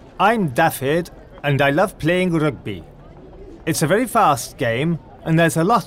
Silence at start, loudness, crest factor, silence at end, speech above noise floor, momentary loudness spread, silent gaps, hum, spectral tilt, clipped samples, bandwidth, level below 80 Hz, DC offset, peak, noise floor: 0.15 s; -19 LUFS; 16 dB; 0 s; 22 dB; 11 LU; none; none; -5.5 dB/octave; under 0.1%; 16 kHz; -46 dBFS; under 0.1%; -4 dBFS; -40 dBFS